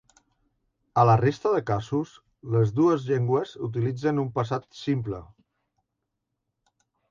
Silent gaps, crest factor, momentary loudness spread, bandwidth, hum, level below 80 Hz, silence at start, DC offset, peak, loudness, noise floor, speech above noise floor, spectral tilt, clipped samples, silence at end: none; 20 dB; 11 LU; 7.4 kHz; none; -58 dBFS; 0.95 s; under 0.1%; -6 dBFS; -25 LUFS; -82 dBFS; 58 dB; -8 dB/octave; under 0.1%; 1.85 s